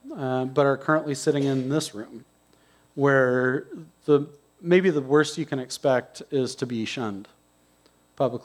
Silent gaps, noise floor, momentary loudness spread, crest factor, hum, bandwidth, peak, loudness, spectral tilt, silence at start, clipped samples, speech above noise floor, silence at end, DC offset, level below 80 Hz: none; -62 dBFS; 15 LU; 18 dB; 60 Hz at -65 dBFS; 13.5 kHz; -6 dBFS; -24 LUFS; -5.5 dB/octave; 0.05 s; under 0.1%; 38 dB; 0.05 s; under 0.1%; -72 dBFS